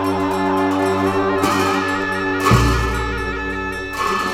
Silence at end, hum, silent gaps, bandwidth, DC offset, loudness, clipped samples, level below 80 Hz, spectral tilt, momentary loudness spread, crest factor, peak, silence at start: 0 s; none; none; 16.5 kHz; under 0.1%; -18 LUFS; under 0.1%; -30 dBFS; -5.5 dB/octave; 8 LU; 16 dB; -2 dBFS; 0 s